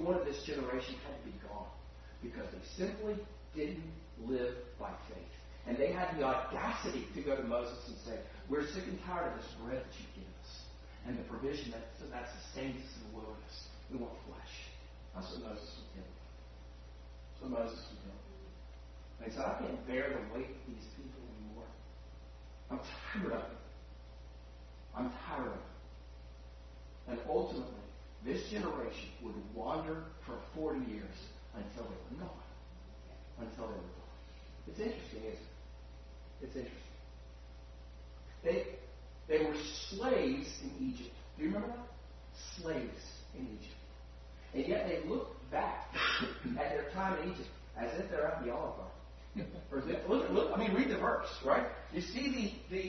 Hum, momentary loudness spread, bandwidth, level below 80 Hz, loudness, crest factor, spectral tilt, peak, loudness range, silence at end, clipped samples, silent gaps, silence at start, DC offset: none; 20 LU; 6.2 kHz; -52 dBFS; -40 LUFS; 24 dB; -4 dB/octave; -16 dBFS; 10 LU; 0 s; under 0.1%; none; 0 s; under 0.1%